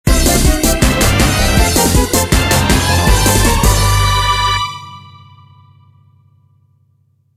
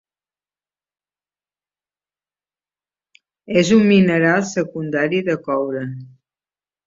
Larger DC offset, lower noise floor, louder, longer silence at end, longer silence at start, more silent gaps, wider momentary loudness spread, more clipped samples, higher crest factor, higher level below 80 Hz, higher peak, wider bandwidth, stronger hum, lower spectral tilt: neither; second, -56 dBFS vs under -90 dBFS; first, -12 LUFS vs -17 LUFS; first, 2.35 s vs 0.8 s; second, 0.05 s vs 3.5 s; neither; second, 3 LU vs 12 LU; neither; about the same, 14 dB vs 18 dB; first, -18 dBFS vs -58 dBFS; about the same, 0 dBFS vs -2 dBFS; first, 16.5 kHz vs 7.8 kHz; second, none vs 50 Hz at -45 dBFS; second, -4 dB/octave vs -6 dB/octave